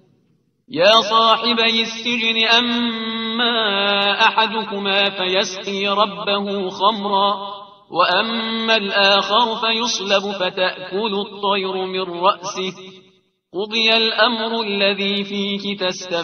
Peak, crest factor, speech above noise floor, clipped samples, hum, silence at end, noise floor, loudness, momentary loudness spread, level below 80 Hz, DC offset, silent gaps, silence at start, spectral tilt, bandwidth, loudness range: 0 dBFS; 18 dB; 44 dB; under 0.1%; none; 0 s; -62 dBFS; -17 LUFS; 9 LU; -66 dBFS; under 0.1%; none; 0.7 s; -3 dB/octave; 7.2 kHz; 4 LU